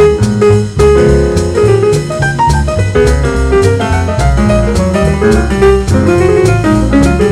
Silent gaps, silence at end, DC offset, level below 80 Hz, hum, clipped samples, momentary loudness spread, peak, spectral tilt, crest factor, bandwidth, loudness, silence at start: none; 0 s; under 0.1%; -16 dBFS; none; 0.8%; 3 LU; 0 dBFS; -6.5 dB/octave; 8 dB; 13 kHz; -9 LUFS; 0 s